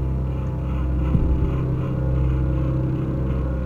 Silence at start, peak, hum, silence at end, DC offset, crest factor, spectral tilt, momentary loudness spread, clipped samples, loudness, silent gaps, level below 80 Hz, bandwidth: 0 s; -6 dBFS; none; 0 s; under 0.1%; 14 dB; -10.5 dB/octave; 4 LU; under 0.1%; -23 LUFS; none; -24 dBFS; 3.6 kHz